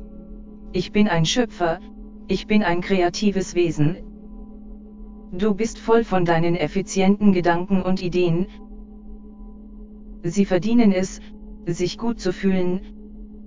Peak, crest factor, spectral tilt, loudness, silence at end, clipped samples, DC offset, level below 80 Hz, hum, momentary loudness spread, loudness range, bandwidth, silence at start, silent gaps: -4 dBFS; 18 dB; -6 dB/octave; -21 LUFS; 0 s; under 0.1%; 1%; -42 dBFS; none; 24 LU; 4 LU; 7.6 kHz; 0 s; none